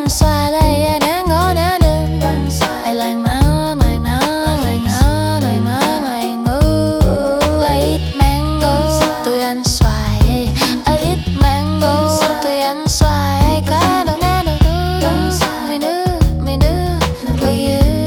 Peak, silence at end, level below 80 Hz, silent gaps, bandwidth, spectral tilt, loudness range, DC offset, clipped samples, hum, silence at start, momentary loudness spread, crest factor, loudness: 0 dBFS; 0 s; -20 dBFS; none; 18 kHz; -5.5 dB/octave; 1 LU; under 0.1%; under 0.1%; none; 0 s; 3 LU; 14 dB; -15 LUFS